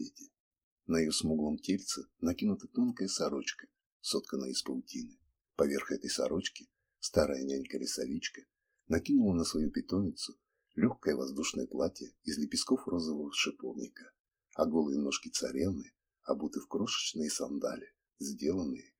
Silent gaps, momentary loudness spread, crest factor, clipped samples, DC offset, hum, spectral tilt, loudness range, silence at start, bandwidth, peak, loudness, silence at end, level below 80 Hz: 0.40-0.51 s, 0.63-0.77 s, 3.86-4.00 s, 14.20-14.24 s; 12 LU; 22 dB; under 0.1%; under 0.1%; none; -4 dB/octave; 3 LU; 0 s; 17 kHz; -14 dBFS; -35 LUFS; 0.2 s; -60 dBFS